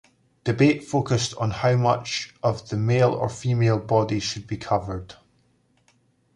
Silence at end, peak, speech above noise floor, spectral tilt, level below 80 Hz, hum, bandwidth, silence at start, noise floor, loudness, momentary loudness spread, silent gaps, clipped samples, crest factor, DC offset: 1.25 s; -4 dBFS; 42 dB; -6 dB/octave; -50 dBFS; none; 10.5 kHz; 0.45 s; -64 dBFS; -23 LUFS; 9 LU; none; under 0.1%; 20 dB; under 0.1%